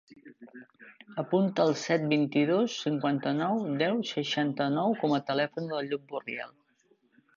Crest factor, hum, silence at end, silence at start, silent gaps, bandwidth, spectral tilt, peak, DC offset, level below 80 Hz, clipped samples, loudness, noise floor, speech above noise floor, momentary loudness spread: 18 dB; none; 0.85 s; 0.1 s; none; 7.4 kHz; -6 dB/octave; -12 dBFS; under 0.1%; -78 dBFS; under 0.1%; -29 LUFS; -68 dBFS; 40 dB; 10 LU